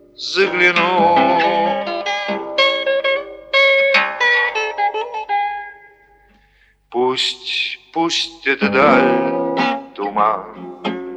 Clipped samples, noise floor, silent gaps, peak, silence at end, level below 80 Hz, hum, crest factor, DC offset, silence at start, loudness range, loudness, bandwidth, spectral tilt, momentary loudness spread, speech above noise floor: under 0.1%; -55 dBFS; none; 0 dBFS; 0 s; -58 dBFS; 50 Hz at -70 dBFS; 16 dB; under 0.1%; 0.2 s; 6 LU; -16 LUFS; 10 kHz; -3.5 dB/octave; 12 LU; 40 dB